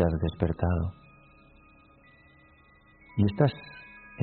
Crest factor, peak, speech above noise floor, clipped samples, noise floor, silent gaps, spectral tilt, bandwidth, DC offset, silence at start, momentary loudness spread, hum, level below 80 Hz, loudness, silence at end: 22 dB; -8 dBFS; 32 dB; under 0.1%; -58 dBFS; none; -7.5 dB/octave; 4.5 kHz; under 0.1%; 0 s; 21 LU; none; -44 dBFS; -28 LUFS; 0 s